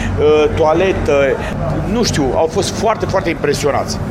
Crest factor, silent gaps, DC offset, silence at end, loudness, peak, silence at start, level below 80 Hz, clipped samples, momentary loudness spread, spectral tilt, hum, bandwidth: 12 dB; none; under 0.1%; 0 s; -15 LUFS; -2 dBFS; 0 s; -30 dBFS; under 0.1%; 6 LU; -5 dB/octave; none; 15 kHz